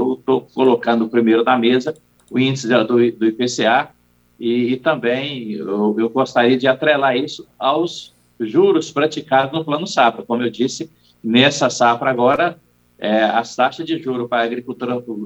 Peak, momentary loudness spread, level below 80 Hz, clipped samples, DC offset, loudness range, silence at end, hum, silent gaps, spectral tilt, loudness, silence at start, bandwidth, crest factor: -2 dBFS; 10 LU; -62 dBFS; under 0.1%; under 0.1%; 2 LU; 0 s; none; none; -5 dB/octave; -17 LUFS; 0 s; 8.4 kHz; 16 dB